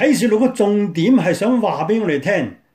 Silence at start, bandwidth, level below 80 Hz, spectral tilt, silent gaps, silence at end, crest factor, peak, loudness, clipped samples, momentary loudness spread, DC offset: 0 s; 16 kHz; -62 dBFS; -6 dB/octave; none; 0.2 s; 12 dB; -4 dBFS; -17 LUFS; under 0.1%; 4 LU; under 0.1%